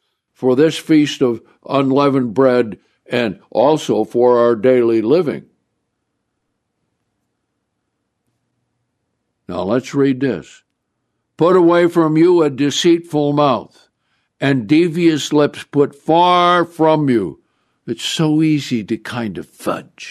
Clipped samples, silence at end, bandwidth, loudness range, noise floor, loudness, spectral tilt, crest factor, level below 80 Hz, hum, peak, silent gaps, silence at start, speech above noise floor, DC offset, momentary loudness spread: under 0.1%; 0 s; 13.5 kHz; 8 LU; -72 dBFS; -15 LUFS; -6 dB/octave; 16 dB; -62 dBFS; none; -2 dBFS; none; 0.4 s; 58 dB; under 0.1%; 12 LU